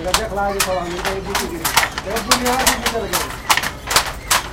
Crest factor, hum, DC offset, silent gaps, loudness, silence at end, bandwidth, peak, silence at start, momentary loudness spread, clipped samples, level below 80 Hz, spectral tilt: 20 dB; none; under 0.1%; none; -18 LUFS; 0 s; 17 kHz; 0 dBFS; 0 s; 6 LU; under 0.1%; -34 dBFS; -2 dB/octave